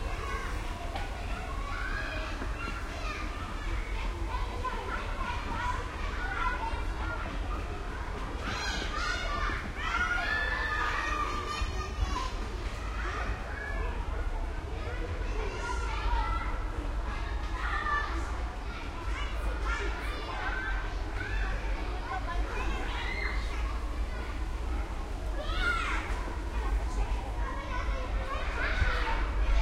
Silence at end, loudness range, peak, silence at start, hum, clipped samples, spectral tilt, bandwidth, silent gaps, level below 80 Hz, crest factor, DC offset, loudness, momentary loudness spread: 0 s; 5 LU; -14 dBFS; 0 s; none; under 0.1%; -5 dB/octave; 12 kHz; none; -34 dBFS; 18 dB; under 0.1%; -34 LUFS; 7 LU